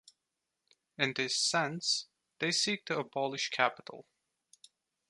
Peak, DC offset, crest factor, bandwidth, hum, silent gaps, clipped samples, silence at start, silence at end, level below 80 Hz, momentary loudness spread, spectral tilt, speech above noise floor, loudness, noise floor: -10 dBFS; under 0.1%; 26 dB; 11.5 kHz; none; none; under 0.1%; 1 s; 1.1 s; -82 dBFS; 17 LU; -2 dB/octave; 53 dB; -32 LUFS; -87 dBFS